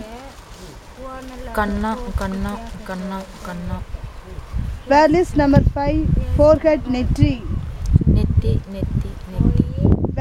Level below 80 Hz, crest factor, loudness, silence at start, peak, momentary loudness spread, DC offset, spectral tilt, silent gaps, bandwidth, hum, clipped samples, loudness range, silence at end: -26 dBFS; 18 dB; -19 LUFS; 0 s; 0 dBFS; 20 LU; under 0.1%; -8 dB/octave; none; 14.5 kHz; none; under 0.1%; 10 LU; 0 s